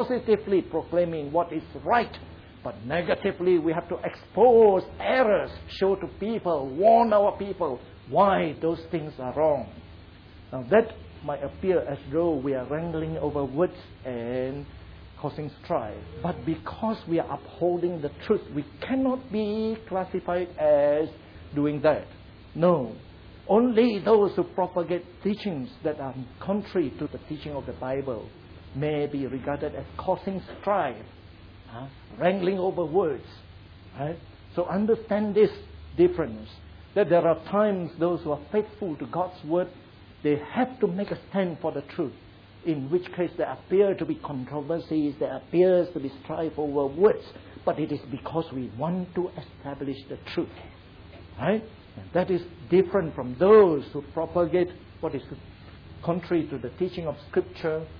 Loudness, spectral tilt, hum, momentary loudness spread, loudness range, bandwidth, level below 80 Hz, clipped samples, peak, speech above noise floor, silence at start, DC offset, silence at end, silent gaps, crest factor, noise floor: -26 LUFS; -9.5 dB/octave; none; 16 LU; 8 LU; 5.4 kHz; -52 dBFS; under 0.1%; -8 dBFS; 22 dB; 0 s; under 0.1%; 0 s; none; 18 dB; -48 dBFS